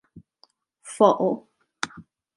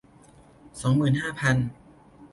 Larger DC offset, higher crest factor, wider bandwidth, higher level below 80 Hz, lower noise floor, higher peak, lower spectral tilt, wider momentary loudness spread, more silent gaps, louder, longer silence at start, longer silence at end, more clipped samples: neither; first, 24 dB vs 18 dB; about the same, 11.5 kHz vs 11.5 kHz; second, -68 dBFS vs -54 dBFS; first, -63 dBFS vs -53 dBFS; first, -4 dBFS vs -8 dBFS; about the same, -5 dB/octave vs -6 dB/octave; first, 15 LU vs 10 LU; neither; about the same, -23 LUFS vs -25 LUFS; second, 0.15 s vs 0.75 s; first, 0.35 s vs 0.05 s; neither